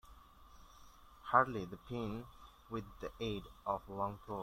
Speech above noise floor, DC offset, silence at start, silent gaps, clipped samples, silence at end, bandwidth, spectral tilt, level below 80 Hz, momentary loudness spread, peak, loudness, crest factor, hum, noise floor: 21 dB; under 0.1%; 0.05 s; none; under 0.1%; 0 s; 16.5 kHz; -6.5 dB/octave; -60 dBFS; 17 LU; -14 dBFS; -39 LUFS; 28 dB; none; -60 dBFS